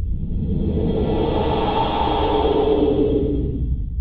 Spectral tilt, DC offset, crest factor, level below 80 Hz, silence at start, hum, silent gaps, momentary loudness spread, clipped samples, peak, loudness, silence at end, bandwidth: -10 dB/octave; under 0.1%; 14 dB; -26 dBFS; 0 s; none; none; 7 LU; under 0.1%; -6 dBFS; -20 LUFS; 0 s; 5.2 kHz